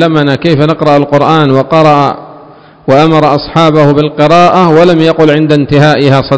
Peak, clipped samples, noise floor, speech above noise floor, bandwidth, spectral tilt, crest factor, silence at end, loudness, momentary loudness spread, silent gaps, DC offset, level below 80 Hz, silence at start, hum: 0 dBFS; 10%; -34 dBFS; 28 dB; 8 kHz; -7 dB/octave; 6 dB; 0 s; -6 LUFS; 4 LU; none; under 0.1%; -38 dBFS; 0 s; none